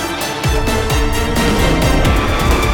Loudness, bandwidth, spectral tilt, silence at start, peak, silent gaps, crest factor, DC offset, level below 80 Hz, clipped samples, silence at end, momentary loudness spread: -15 LUFS; 18 kHz; -5 dB/octave; 0 s; -2 dBFS; none; 12 dB; under 0.1%; -18 dBFS; under 0.1%; 0 s; 3 LU